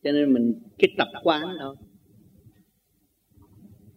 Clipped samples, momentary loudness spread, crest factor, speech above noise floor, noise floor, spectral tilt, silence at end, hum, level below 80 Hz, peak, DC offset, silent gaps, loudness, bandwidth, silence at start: under 0.1%; 13 LU; 24 dB; 46 dB; -69 dBFS; -6.5 dB/octave; 2.25 s; none; -68 dBFS; -2 dBFS; under 0.1%; none; -24 LUFS; 15 kHz; 0.05 s